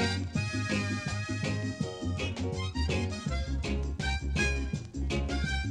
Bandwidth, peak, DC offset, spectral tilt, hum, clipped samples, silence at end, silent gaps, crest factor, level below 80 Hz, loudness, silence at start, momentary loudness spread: 11 kHz; -16 dBFS; under 0.1%; -5 dB/octave; none; under 0.1%; 0 s; none; 16 dB; -36 dBFS; -32 LUFS; 0 s; 4 LU